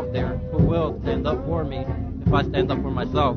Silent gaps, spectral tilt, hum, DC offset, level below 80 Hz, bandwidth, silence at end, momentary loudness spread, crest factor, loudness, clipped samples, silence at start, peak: none; -9 dB/octave; none; under 0.1%; -32 dBFS; 6.4 kHz; 0 s; 6 LU; 18 dB; -24 LUFS; under 0.1%; 0 s; -4 dBFS